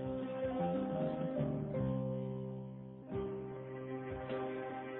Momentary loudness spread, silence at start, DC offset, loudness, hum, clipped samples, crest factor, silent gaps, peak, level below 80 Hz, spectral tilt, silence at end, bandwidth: 9 LU; 0 s; under 0.1%; -40 LUFS; none; under 0.1%; 14 dB; none; -26 dBFS; -62 dBFS; -8 dB/octave; 0 s; 4 kHz